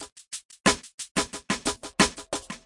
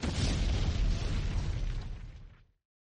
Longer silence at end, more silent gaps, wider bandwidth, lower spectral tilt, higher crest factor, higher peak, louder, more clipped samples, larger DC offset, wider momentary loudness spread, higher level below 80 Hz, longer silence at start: second, 0.1 s vs 0.65 s; first, 0.12-0.16 s, 0.45-0.49 s, 0.94-0.98 s, 1.11-1.15 s vs none; first, 11.5 kHz vs 10 kHz; second, -2.5 dB/octave vs -5.5 dB/octave; first, 24 dB vs 12 dB; first, -4 dBFS vs -20 dBFS; first, -27 LUFS vs -34 LUFS; neither; neither; about the same, 14 LU vs 15 LU; second, -52 dBFS vs -34 dBFS; about the same, 0 s vs 0 s